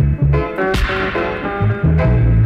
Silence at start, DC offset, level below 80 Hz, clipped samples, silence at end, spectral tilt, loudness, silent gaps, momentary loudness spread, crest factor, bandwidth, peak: 0 s; under 0.1%; -20 dBFS; under 0.1%; 0 s; -8 dB/octave; -16 LUFS; none; 5 LU; 8 dB; 12 kHz; -6 dBFS